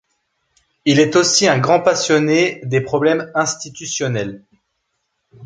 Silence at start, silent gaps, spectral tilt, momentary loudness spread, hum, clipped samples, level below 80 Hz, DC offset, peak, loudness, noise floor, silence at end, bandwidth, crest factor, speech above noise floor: 0.85 s; none; -4 dB/octave; 10 LU; none; under 0.1%; -58 dBFS; under 0.1%; -2 dBFS; -16 LUFS; -71 dBFS; 0 s; 9.6 kHz; 16 dB; 56 dB